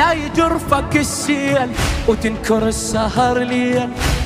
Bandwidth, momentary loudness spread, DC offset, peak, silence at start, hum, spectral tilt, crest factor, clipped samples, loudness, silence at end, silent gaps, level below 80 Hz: 16 kHz; 3 LU; under 0.1%; -2 dBFS; 0 s; none; -4.5 dB/octave; 16 dB; under 0.1%; -17 LUFS; 0 s; none; -28 dBFS